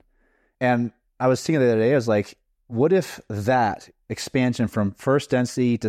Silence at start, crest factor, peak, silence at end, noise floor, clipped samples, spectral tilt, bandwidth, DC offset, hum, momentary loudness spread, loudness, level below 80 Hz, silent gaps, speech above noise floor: 0.6 s; 12 dB; -10 dBFS; 0 s; -65 dBFS; under 0.1%; -6.5 dB/octave; 15 kHz; under 0.1%; none; 12 LU; -22 LUFS; -60 dBFS; none; 43 dB